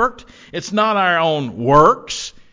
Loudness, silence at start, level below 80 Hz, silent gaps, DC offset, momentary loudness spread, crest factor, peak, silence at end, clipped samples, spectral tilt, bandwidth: -16 LUFS; 0 s; -44 dBFS; none; under 0.1%; 14 LU; 16 dB; 0 dBFS; 0.25 s; under 0.1%; -4.5 dB/octave; 7.6 kHz